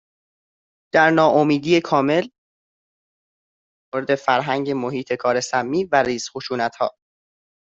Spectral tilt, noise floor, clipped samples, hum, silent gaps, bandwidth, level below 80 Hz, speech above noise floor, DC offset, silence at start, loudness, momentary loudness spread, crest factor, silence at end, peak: -5 dB/octave; under -90 dBFS; under 0.1%; none; 2.38-3.92 s; 8.2 kHz; -62 dBFS; over 71 dB; under 0.1%; 0.95 s; -20 LUFS; 11 LU; 18 dB; 0.8 s; -2 dBFS